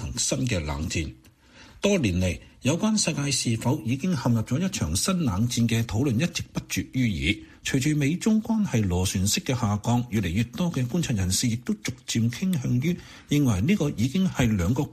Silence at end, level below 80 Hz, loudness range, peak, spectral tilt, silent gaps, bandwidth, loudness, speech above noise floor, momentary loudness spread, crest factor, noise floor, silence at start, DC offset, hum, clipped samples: 0 s; -44 dBFS; 1 LU; -8 dBFS; -5 dB/octave; none; 15 kHz; -25 LUFS; 27 dB; 6 LU; 16 dB; -51 dBFS; 0 s; under 0.1%; none; under 0.1%